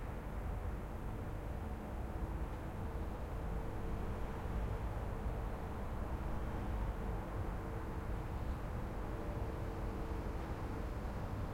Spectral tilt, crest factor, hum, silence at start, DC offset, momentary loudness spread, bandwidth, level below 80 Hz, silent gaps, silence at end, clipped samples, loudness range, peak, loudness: -7.5 dB/octave; 12 dB; none; 0 s; under 0.1%; 3 LU; 16.5 kHz; -44 dBFS; none; 0 s; under 0.1%; 2 LU; -28 dBFS; -44 LUFS